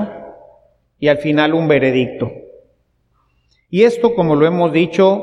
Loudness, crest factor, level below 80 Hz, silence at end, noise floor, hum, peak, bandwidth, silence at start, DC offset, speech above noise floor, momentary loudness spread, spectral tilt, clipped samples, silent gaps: -15 LUFS; 16 dB; -52 dBFS; 0 s; -61 dBFS; none; 0 dBFS; 10.5 kHz; 0 s; under 0.1%; 48 dB; 12 LU; -7.5 dB/octave; under 0.1%; none